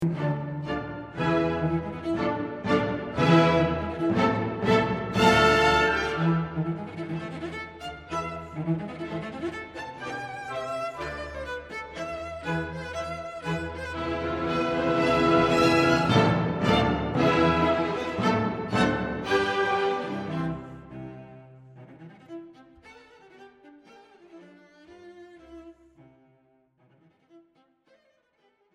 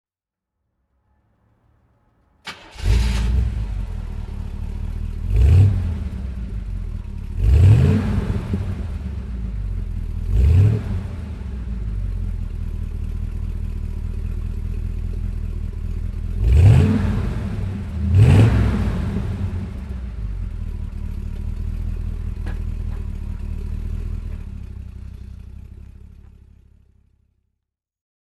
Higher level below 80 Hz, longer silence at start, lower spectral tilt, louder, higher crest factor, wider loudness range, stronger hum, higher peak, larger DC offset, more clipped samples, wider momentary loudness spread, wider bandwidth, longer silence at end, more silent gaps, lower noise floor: second, -48 dBFS vs -24 dBFS; second, 0 s vs 2.45 s; second, -6 dB/octave vs -8 dB/octave; second, -26 LUFS vs -22 LUFS; about the same, 20 dB vs 18 dB; about the same, 12 LU vs 13 LU; neither; second, -8 dBFS vs -2 dBFS; neither; neither; about the same, 15 LU vs 17 LU; first, 13 kHz vs 10.5 kHz; second, 1.35 s vs 2.15 s; neither; second, -68 dBFS vs -87 dBFS